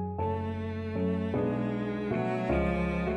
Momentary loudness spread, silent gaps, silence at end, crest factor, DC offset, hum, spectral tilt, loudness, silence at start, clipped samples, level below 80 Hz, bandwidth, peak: 5 LU; none; 0 s; 14 dB; under 0.1%; none; -9 dB/octave; -31 LUFS; 0 s; under 0.1%; -44 dBFS; 8.8 kHz; -16 dBFS